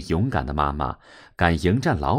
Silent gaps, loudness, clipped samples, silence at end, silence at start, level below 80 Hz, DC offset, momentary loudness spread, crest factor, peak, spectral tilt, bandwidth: none; -23 LUFS; under 0.1%; 0 s; 0 s; -34 dBFS; under 0.1%; 12 LU; 20 dB; -2 dBFS; -7 dB/octave; 13 kHz